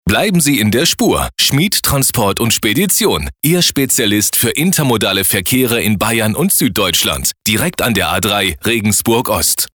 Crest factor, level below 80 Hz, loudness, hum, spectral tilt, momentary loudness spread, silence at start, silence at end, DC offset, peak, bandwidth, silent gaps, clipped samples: 12 dB; -36 dBFS; -12 LUFS; none; -3 dB/octave; 3 LU; 0.05 s; 0.1 s; under 0.1%; -2 dBFS; over 20 kHz; none; under 0.1%